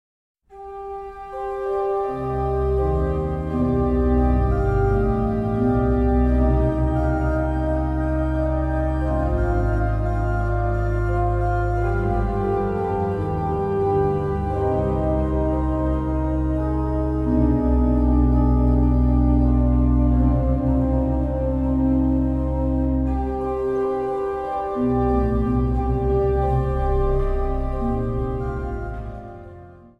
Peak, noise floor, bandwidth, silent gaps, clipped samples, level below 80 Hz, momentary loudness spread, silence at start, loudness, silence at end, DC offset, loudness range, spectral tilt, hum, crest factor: -6 dBFS; -43 dBFS; 3.8 kHz; none; under 0.1%; -24 dBFS; 7 LU; 0.5 s; -22 LUFS; 0.25 s; under 0.1%; 4 LU; -10.5 dB/octave; none; 14 dB